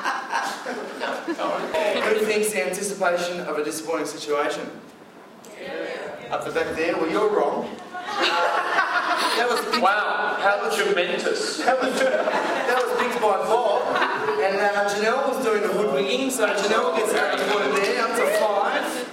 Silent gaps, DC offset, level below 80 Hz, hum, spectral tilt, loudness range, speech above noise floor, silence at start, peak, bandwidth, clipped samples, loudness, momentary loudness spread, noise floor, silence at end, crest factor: none; under 0.1%; -70 dBFS; none; -2.5 dB/octave; 5 LU; 23 dB; 0 s; -6 dBFS; 16.5 kHz; under 0.1%; -22 LUFS; 9 LU; -45 dBFS; 0 s; 16 dB